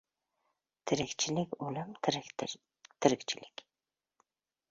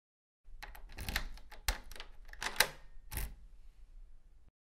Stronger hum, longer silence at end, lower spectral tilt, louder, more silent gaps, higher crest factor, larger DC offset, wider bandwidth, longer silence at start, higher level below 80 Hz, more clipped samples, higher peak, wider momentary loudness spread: neither; first, 1.25 s vs 0.3 s; first, -4 dB/octave vs -1.5 dB/octave; first, -35 LUFS vs -38 LUFS; neither; second, 28 dB vs 36 dB; neither; second, 7.6 kHz vs 16 kHz; first, 0.85 s vs 0.45 s; second, -70 dBFS vs -48 dBFS; neither; about the same, -10 dBFS vs -8 dBFS; second, 15 LU vs 21 LU